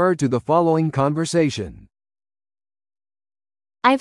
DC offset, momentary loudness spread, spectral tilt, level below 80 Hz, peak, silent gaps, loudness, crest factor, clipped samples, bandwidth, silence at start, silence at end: under 0.1%; 7 LU; -6 dB/octave; -56 dBFS; 0 dBFS; none; -20 LUFS; 22 dB; under 0.1%; 12 kHz; 0 s; 0 s